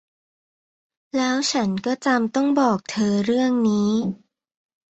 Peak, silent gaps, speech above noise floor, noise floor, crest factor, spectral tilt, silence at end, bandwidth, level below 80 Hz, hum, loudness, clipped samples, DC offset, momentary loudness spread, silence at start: -6 dBFS; none; over 70 dB; under -90 dBFS; 16 dB; -5 dB/octave; 0.75 s; 8.2 kHz; -62 dBFS; none; -21 LUFS; under 0.1%; under 0.1%; 5 LU; 1.15 s